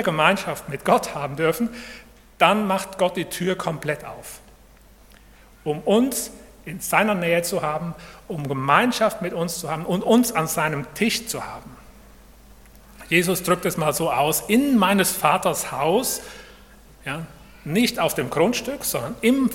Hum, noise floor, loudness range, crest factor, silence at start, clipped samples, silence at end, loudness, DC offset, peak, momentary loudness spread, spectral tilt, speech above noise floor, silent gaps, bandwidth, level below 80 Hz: none; -50 dBFS; 5 LU; 22 dB; 0 s; under 0.1%; 0 s; -22 LUFS; under 0.1%; 0 dBFS; 16 LU; -4 dB/octave; 28 dB; none; 17.5 kHz; -52 dBFS